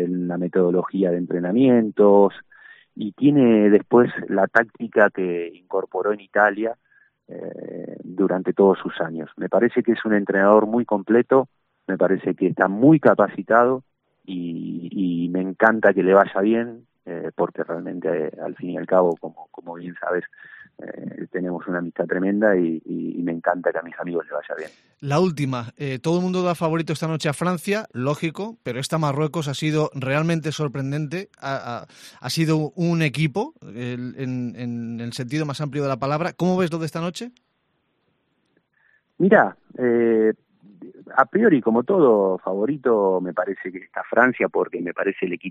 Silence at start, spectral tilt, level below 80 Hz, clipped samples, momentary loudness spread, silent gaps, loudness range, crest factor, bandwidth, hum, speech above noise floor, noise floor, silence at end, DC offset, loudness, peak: 0 s; -7 dB/octave; -66 dBFS; under 0.1%; 15 LU; none; 7 LU; 20 dB; 13 kHz; none; 49 dB; -70 dBFS; 0 s; under 0.1%; -21 LUFS; 0 dBFS